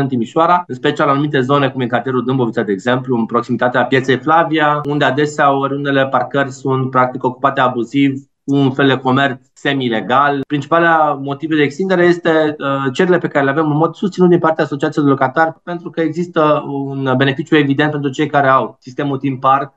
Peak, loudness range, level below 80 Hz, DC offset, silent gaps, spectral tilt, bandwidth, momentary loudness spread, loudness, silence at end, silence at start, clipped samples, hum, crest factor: 0 dBFS; 1 LU; -62 dBFS; under 0.1%; none; -7 dB/octave; 8.2 kHz; 6 LU; -15 LUFS; 0.1 s; 0 s; under 0.1%; none; 14 dB